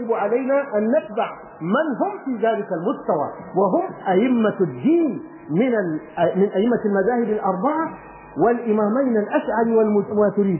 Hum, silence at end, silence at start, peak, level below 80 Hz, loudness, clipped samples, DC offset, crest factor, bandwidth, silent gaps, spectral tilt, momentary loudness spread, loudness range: none; 0 s; 0 s; -6 dBFS; -60 dBFS; -21 LUFS; under 0.1%; under 0.1%; 14 dB; 3.2 kHz; none; -11.5 dB/octave; 7 LU; 2 LU